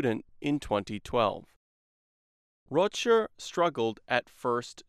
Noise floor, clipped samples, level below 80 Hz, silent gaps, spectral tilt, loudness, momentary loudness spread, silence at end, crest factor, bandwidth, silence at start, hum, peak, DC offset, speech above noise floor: under -90 dBFS; under 0.1%; -58 dBFS; 1.56-2.66 s; -5 dB/octave; -29 LUFS; 7 LU; 0.05 s; 22 dB; 13.5 kHz; 0 s; none; -10 dBFS; under 0.1%; over 61 dB